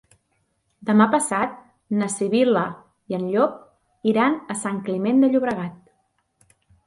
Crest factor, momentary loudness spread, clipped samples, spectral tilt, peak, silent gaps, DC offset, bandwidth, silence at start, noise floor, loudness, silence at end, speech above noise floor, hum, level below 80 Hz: 18 dB; 12 LU; under 0.1%; -5.5 dB/octave; -4 dBFS; none; under 0.1%; 11.5 kHz; 0.8 s; -70 dBFS; -22 LUFS; 1.1 s; 49 dB; none; -66 dBFS